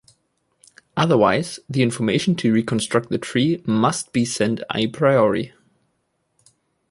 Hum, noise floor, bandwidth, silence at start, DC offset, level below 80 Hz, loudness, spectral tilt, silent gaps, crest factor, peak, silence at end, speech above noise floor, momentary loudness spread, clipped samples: none; -71 dBFS; 11.5 kHz; 0.95 s; under 0.1%; -56 dBFS; -20 LUFS; -5.5 dB/octave; none; 18 dB; -2 dBFS; 1.45 s; 51 dB; 7 LU; under 0.1%